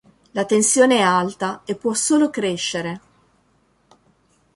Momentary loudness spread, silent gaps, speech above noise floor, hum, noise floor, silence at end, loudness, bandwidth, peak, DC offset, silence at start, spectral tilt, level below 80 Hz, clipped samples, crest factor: 13 LU; none; 43 dB; none; -61 dBFS; 1.55 s; -19 LUFS; 11.5 kHz; -2 dBFS; under 0.1%; 0.35 s; -3 dB/octave; -64 dBFS; under 0.1%; 18 dB